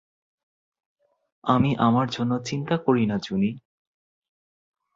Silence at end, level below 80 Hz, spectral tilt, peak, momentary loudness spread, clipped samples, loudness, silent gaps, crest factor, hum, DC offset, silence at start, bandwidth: 1.35 s; -58 dBFS; -7 dB/octave; -6 dBFS; 7 LU; under 0.1%; -24 LUFS; none; 22 dB; none; under 0.1%; 1.45 s; 7.8 kHz